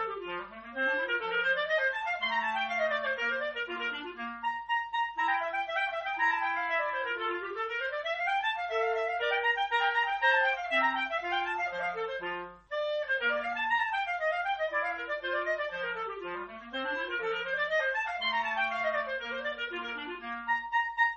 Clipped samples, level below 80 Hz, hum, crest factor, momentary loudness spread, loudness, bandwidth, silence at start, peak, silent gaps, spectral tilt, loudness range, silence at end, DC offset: under 0.1%; -68 dBFS; none; 18 dB; 9 LU; -31 LUFS; 8.2 kHz; 0 s; -14 dBFS; none; -3 dB/octave; 4 LU; 0 s; under 0.1%